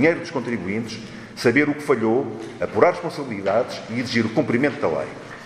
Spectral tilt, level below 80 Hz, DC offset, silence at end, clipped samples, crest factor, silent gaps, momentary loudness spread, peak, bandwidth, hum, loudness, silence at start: -6 dB/octave; -60 dBFS; under 0.1%; 0 s; under 0.1%; 22 dB; none; 11 LU; 0 dBFS; 14 kHz; none; -22 LUFS; 0 s